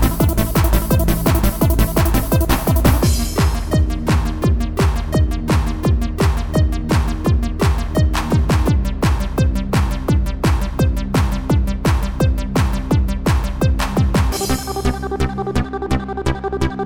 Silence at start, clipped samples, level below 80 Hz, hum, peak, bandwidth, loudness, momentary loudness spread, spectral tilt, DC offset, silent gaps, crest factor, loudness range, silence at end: 0 s; under 0.1%; -20 dBFS; none; -2 dBFS; over 20 kHz; -18 LUFS; 5 LU; -6 dB/octave; under 0.1%; none; 14 dB; 2 LU; 0 s